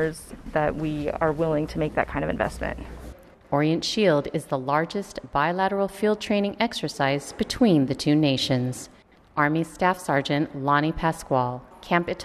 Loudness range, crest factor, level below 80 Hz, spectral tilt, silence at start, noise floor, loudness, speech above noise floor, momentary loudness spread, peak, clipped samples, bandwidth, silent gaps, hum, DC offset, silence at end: 3 LU; 18 dB; -46 dBFS; -5.5 dB/octave; 0 s; -44 dBFS; -24 LUFS; 20 dB; 10 LU; -6 dBFS; under 0.1%; 13.5 kHz; none; none; under 0.1%; 0 s